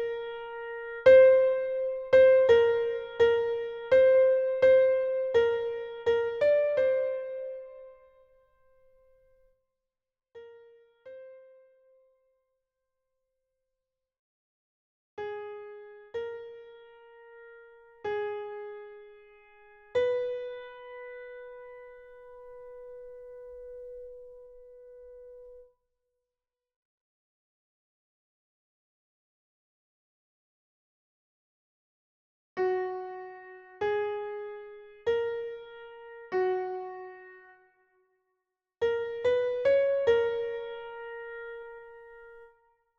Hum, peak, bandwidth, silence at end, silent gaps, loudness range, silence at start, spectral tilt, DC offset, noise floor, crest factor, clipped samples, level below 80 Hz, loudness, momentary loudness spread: none; -8 dBFS; 6.6 kHz; 0.55 s; 14.19-15.17 s, 26.76-32.56 s; 24 LU; 0 s; -5.5 dB/octave; under 0.1%; under -90 dBFS; 22 dB; under 0.1%; -66 dBFS; -26 LUFS; 26 LU